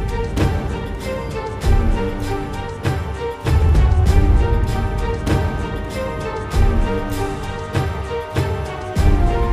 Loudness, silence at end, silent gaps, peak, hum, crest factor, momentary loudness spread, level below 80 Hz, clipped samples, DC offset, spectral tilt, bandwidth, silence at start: -20 LUFS; 0 s; none; -2 dBFS; none; 14 dB; 10 LU; -20 dBFS; under 0.1%; 0.2%; -7 dB/octave; 15 kHz; 0 s